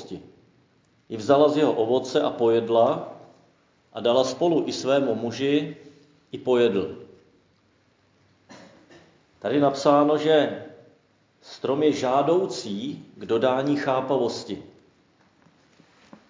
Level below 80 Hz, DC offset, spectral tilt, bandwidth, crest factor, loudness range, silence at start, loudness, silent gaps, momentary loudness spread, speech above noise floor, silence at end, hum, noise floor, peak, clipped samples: -68 dBFS; under 0.1%; -5.5 dB/octave; 7.6 kHz; 20 dB; 6 LU; 0 s; -23 LUFS; none; 18 LU; 41 dB; 1.65 s; none; -63 dBFS; -4 dBFS; under 0.1%